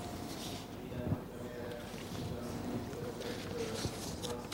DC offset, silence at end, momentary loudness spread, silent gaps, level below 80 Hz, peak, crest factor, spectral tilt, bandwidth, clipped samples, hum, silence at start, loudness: under 0.1%; 0 s; 5 LU; none; -56 dBFS; -22 dBFS; 18 dB; -5 dB/octave; 16 kHz; under 0.1%; none; 0 s; -41 LUFS